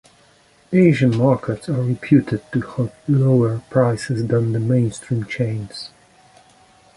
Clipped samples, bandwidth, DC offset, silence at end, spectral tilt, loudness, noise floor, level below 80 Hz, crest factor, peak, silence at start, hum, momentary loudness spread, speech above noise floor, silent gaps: under 0.1%; 11.5 kHz; under 0.1%; 1.1 s; -8 dB/octave; -19 LUFS; -54 dBFS; -52 dBFS; 18 dB; -2 dBFS; 0.7 s; none; 10 LU; 36 dB; none